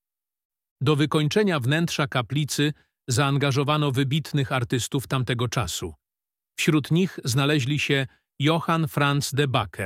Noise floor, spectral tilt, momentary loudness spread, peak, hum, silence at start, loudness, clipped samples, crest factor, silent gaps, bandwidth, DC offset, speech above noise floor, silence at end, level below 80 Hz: under -90 dBFS; -5 dB/octave; 5 LU; -6 dBFS; none; 0.8 s; -24 LUFS; under 0.1%; 18 dB; none; 16 kHz; under 0.1%; over 67 dB; 0 s; -54 dBFS